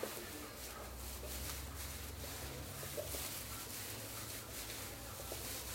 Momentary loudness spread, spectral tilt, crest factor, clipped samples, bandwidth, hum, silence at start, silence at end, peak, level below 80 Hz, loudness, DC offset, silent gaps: 5 LU; -2.5 dB/octave; 18 dB; under 0.1%; 16.5 kHz; none; 0 s; 0 s; -28 dBFS; -54 dBFS; -45 LUFS; under 0.1%; none